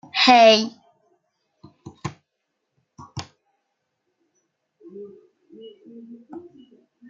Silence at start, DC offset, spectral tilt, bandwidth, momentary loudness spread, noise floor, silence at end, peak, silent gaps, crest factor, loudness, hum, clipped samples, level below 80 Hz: 0.15 s; under 0.1%; -3.5 dB/octave; 7.8 kHz; 29 LU; -78 dBFS; 0.7 s; -2 dBFS; none; 24 dB; -15 LUFS; none; under 0.1%; -68 dBFS